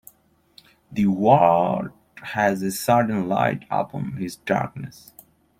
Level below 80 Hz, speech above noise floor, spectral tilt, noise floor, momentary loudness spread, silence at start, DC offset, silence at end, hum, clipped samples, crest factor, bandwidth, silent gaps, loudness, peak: -58 dBFS; 39 dB; -6 dB/octave; -60 dBFS; 16 LU; 0.9 s; under 0.1%; 0.7 s; none; under 0.1%; 20 dB; 16.5 kHz; none; -22 LUFS; -2 dBFS